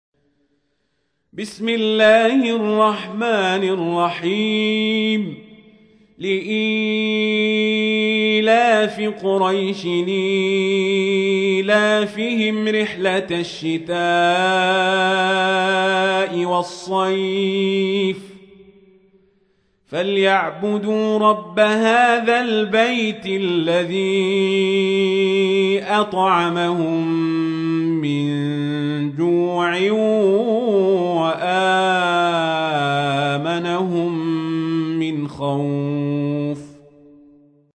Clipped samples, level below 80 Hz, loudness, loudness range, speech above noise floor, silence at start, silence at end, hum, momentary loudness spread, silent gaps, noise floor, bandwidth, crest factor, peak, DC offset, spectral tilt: under 0.1%; -66 dBFS; -18 LUFS; 4 LU; 52 dB; 1.35 s; 1 s; none; 7 LU; none; -70 dBFS; 10 kHz; 16 dB; -2 dBFS; under 0.1%; -5.5 dB/octave